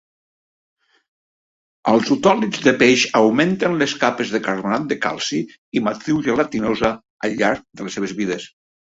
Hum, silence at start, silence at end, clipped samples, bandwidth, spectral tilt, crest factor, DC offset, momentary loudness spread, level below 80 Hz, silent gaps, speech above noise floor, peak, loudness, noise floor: none; 1.85 s; 0.4 s; under 0.1%; 8 kHz; -4.5 dB/octave; 18 dB; under 0.1%; 11 LU; -54 dBFS; 5.58-5.72 s, 7.10-7.20 s; over 71 dB; 0 dBFS; -19 LUFS; under -90 dBFS